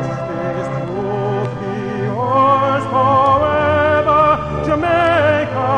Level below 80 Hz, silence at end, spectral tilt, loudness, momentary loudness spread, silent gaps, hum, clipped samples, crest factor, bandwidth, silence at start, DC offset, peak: -38 dBFS; 0 s; -7.5 dB/octave; -15 LUFS; 9 LU; none; none; under 0.1%; 14 dB; 9.6 kHz; 0 s; under 0.1%; -2 dBFS